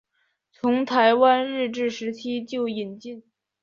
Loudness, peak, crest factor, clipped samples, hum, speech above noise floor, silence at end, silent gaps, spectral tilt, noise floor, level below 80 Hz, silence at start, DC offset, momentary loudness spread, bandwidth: -23 LUFS; -4 dBFS; 20 dB; under 0.1%; none; 49 dB; 0.4 s; none; -5 dB/octave; -72 dBFS; -72 dBFS; 0.65 s; under 0.1%; 18 LU; 7.4 kHz